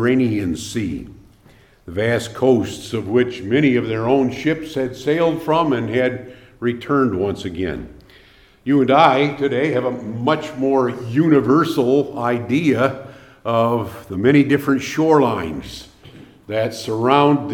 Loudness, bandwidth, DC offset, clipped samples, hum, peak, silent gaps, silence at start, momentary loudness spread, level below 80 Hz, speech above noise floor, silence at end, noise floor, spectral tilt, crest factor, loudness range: -18 LUFS; 17 kHz; under 0.1%; under 0.1%; none; 0 dBFS; none; 0 s; 11 LU; -50 dBFS; 32 dB; 0 s; -50 dBFS; -6.5 dB/octave; 18 dB; 3 LU